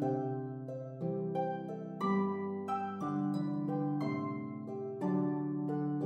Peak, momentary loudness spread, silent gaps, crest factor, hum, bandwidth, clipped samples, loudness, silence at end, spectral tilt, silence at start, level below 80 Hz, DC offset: -22 dBFS; 8 LU; none; 14 dB; none; 8.4 kHz; under 0.1%; -37 LUFS; 0 s; -9.5 dB/octave; 0 s; -84 dBFS; under 0.1%